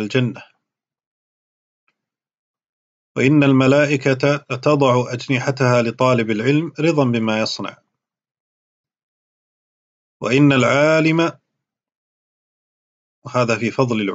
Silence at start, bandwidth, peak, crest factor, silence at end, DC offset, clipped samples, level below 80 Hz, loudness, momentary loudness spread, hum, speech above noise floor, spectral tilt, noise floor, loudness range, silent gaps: 0 s; 8 kHz; -2 dBFS; 18 dB; 0 s; under 0.1%; under 0.1%; -62 dBFS; -17 LUFS; 9 LU; none; 65 dB; -6.5 dB/octave; -81 dBFS; 7 LU; 1.06-1.87 s, 2.38-2.54 s, 2.69-3.15 s, 8.40-8.84 s, 9.03-10.20 s, 11.95-13.22 s